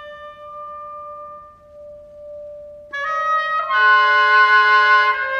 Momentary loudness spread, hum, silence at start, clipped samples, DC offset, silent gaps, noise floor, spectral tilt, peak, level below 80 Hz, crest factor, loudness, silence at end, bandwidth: 24 LU; none; 0 s; under 0.1%; under 0.1%; none; -41 dBFS; -0.5 dB/octave; -2 dBFS; -60 dBFS; 16 dB; -14 LUFS; 0 s; 7 kHz